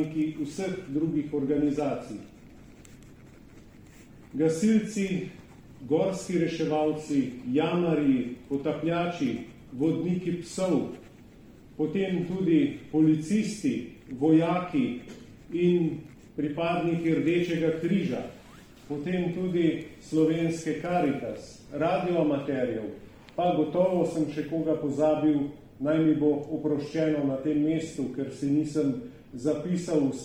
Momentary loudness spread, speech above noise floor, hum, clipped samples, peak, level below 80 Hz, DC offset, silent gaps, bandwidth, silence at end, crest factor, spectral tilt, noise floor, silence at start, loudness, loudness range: 12 LU; 24 dB; none; under 0.1%; -12 dBFS; -58 dBFS; under 0.1%; none; 11.5 kHz; 0 s; 16 dB; -7 dB/octave; -51 dBFS; 0 s; -28 LUFS; 5 LU